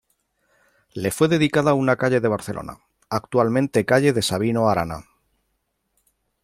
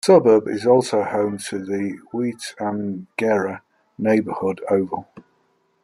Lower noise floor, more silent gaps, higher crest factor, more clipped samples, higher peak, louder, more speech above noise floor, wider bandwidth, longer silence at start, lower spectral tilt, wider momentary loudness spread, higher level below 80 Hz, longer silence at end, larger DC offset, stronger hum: first, -73 dBFS vs -65 dBFS; neither; about the same, 18 dB vs 18 dB; neither; about the same, -4 dBFS vs -2 dBFS; about the same, -20 LUFS vs -21 LUFS; first, 53 dB vs 45 dB; first, 16 kHz vs 13.5 kHz; first, 0.95 s vs 0.05 s; about the same, -5.5 dB/octave vs -6 dB/octave; first, 14 LU vs 11 LU; first, -54 dBFS vs -66 dBFS; first, 1.45 s vs 0.65 s; neither; neither